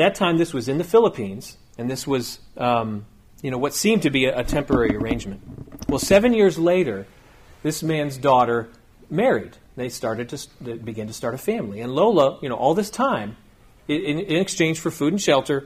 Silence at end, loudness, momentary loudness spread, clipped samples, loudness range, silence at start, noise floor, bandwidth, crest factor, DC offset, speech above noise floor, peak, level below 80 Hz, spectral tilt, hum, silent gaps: 0 s; -21 LUFS; 16 LU; under 0.1%; 4 LU; 0 s; -48 dBFS; 15.5 kHz; 18 dB; under 0.1%; 27 dB; -4 dBFS; -44 dBFS; -5 dB/octave; none; none